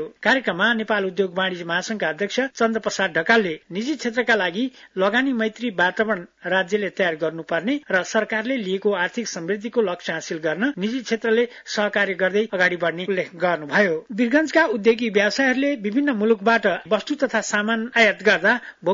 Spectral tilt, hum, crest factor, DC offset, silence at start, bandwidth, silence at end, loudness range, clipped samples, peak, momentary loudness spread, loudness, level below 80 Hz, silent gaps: -4 dB/octave; none; 16 dB; under 0.1%; 0 s; 7.8 kHz; 0 s; 4 LU; under 0.1%; -4 dBFS; 7 LU; -21 LUFS; -66 dBFS; none